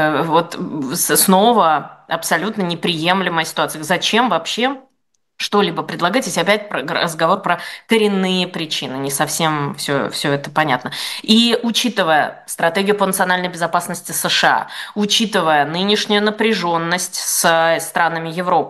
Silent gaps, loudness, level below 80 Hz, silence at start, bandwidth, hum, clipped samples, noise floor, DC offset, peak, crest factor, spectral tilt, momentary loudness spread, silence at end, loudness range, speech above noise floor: none; -17 LUFS; -66 dBFS; 0 s; 13 kHz; none; under 0.1%; -69 dBFS; under 0.1%; 0 dBFS; 16 dB; -3 dB/octave; 8 LU; 0 s; 2 LU; 52 dB